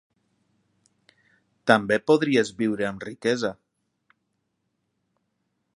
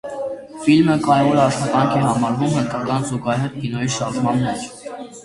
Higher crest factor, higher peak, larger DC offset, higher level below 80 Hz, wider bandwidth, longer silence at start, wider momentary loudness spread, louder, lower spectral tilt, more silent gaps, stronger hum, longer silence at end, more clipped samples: first, 26 dB vs 16 dB; about the same, -2 dBFS vs -2 dBFS; neither; second, -68 dBFS vs -52 dBFS; about the same, 11.5 kHz vs 11.5 kHz; first, 1.65 s vs 0.05 s; second, 10 LU vs 13 LU; second, -23 LUFS vs -19 LUFS; about the same, -5 dB/octave vs -6 dB/octave; neither; neither; first, 2.2 s vs 0 s; neither